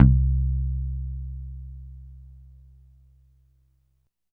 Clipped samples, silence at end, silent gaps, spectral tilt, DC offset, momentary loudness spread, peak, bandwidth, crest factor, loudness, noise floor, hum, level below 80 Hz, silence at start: under 0.1%; 2.2 s; none; -13 dB/octave; under 0.1%; 24 LU; 0 dBFS; 1.7 kHz; 26 dB; -26 LUFS; -71 dBFS; none; -28 dBFS; 0 s